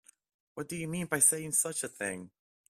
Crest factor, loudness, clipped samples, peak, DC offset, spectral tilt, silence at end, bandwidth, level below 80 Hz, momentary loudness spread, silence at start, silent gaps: 22 dB; -29 LUFS; under 0.1%; -12 dBFS; under 0.1%; -3 dB/octave; 0.4 s; 16 kHz; -70 dBFS; 19 LU; 0.55 s; none